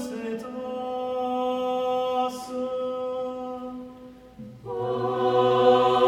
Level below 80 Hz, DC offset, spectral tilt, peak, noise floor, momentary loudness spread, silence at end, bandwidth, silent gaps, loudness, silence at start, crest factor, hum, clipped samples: -62 dBFS; under 0.1%; -6 dB/octave; -6 dBFS; -46 dBFS; 21 LU; 0 s; 13 kHz; none; -26 LUFS; 0 s; 18 dB; none; under 0.1%